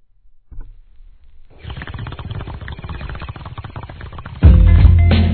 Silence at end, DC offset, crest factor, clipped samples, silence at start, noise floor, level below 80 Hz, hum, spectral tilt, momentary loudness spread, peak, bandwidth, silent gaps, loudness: 0 s; 0.2%; 16 dB; 0.1%; 0.55 s; -47 dBFS; -18 dBFS; none; -11 dB/octave; 22 LU; 0 dBFS; 4.5 kHz; none; -11 LUFS